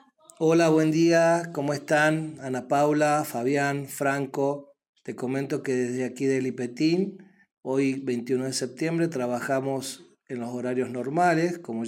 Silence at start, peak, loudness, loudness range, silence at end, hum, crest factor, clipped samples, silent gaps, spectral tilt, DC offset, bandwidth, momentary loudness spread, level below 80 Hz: 0.4 s; -8 dBFS; -26 LUFS; 5 LU; 0 s; none; 16 dB; under 0.1%; 4.89-4.93 s; -5.5 dB/octave; under 0.1%; 16.5 kHz; 12 LU; -72 dBFS